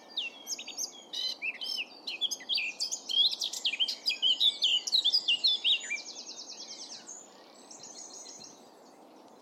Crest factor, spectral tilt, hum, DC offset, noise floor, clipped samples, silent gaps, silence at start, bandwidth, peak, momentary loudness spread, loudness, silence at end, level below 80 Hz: 18 dB; 2.5 dB/octave; none; under 0.1%; -55 dBFS; under 0.1%; none; 0 s; 16 kHz; -16 dBFS; 20 LU; -28 LUFS; 0 s; under -90 dBFS